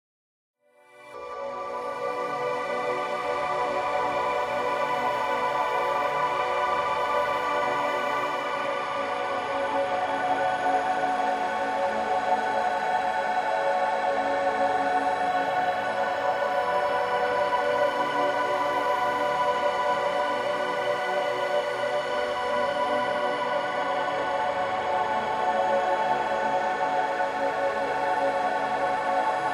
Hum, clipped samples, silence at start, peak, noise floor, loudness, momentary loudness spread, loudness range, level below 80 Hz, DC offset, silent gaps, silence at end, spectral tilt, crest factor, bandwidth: none; under 0.1%; 0.95 s; -12 dBFS; -54 dBFS; -26 LUFS; 3 LU; 2 LU; -62 dBFS; under 0.1%; none; 0 s; -3.5 dB/octave; 14 dB; 14 kHz